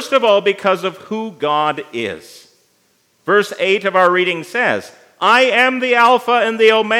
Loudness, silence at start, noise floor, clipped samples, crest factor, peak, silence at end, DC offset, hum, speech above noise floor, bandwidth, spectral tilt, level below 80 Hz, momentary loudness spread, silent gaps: -15 LUFS; 0 s; -59 dBFS; under 0.1%; 16 dB; 0 dBFS; 0 s; under 0.1%; none; 45 dB; 16 kHz; -4 dB/octave; -74 dBFS; 12 LU; none